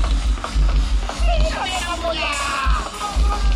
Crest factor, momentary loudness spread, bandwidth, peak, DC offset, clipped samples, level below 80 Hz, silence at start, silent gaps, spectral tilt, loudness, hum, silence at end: 14 dB; 3 LU; 12 kHz; -6 dBFS; under 0.1%; under 0.1%; -20 dBFS; 0 s; none; -4 dB/octave; -21 LUFS; none; 0 s